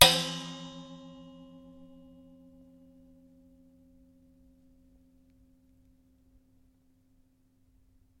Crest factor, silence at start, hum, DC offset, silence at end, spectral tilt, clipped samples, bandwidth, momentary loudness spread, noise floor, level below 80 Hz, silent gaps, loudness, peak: 36 dB; 0 s; none; under 0.1%; 7.25 s; -1.5 dB/octave; under 0.1%; 16.5 kHz; 25 LU; -67 dBFS; -60 dBFS; none; -28 LUFS; 0 dBFS